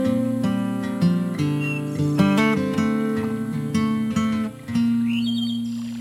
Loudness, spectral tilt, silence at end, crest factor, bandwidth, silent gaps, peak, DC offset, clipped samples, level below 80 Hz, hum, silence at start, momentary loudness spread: -22 LUFS; -6.5 dB/octave; 0 s; 18 dB; 15.5 kHz; none; -4 dBFS; under 0.1%; under 0.1%; -56 dBFS; none; 0 s; 6 LU